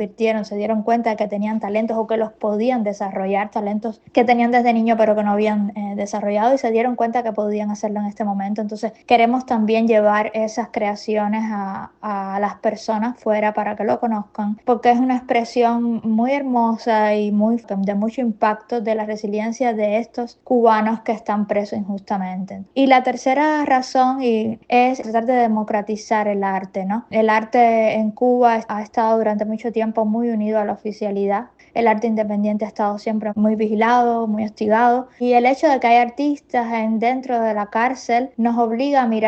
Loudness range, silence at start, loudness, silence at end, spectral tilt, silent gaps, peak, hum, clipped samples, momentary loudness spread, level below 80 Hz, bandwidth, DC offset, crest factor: 3 LU; 0 s; -19 LUFS; 0 s; -6.5 dB/octave; none; 0 dBFS; none; under 0.1%; 9 LU; -62 dBFS; 8.2 kHz; under 0.1%; 18 dB